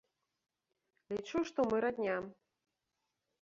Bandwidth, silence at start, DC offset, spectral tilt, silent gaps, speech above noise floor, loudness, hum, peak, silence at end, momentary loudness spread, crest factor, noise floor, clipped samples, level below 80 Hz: 7.6 kHz; 1.1 s; under 0.1%; -4.5 dB/octave; none; 51 dB; -36 LUFS; none; -20 dBFS; 1.1 s; 10 LU; 20 dB; -87 dBFS; under 0.1%; -72 dBFS